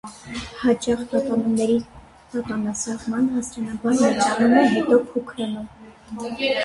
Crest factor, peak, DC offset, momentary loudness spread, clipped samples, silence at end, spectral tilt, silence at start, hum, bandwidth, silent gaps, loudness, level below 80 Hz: 18 dB; -4 dBFS; under 0.1%; 16 LU; under 0.1%; 0 s; -4.5 dB/octave; 0.05 s; none; 11.5 kHz; none; -22 LUFS; -52 dBFS